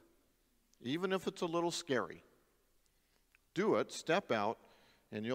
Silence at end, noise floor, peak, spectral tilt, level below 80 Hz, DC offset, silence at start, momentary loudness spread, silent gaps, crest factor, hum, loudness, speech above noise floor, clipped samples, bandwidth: 0 s; -75 dBFS; -18 dBFS; -4.5 dB/octave; -78 dBFS; under 0.1%; 0.85 s; 14 LU; none; 20 dB; none; -37 LUFS; 38 dB; under 0.1%; 16 kHz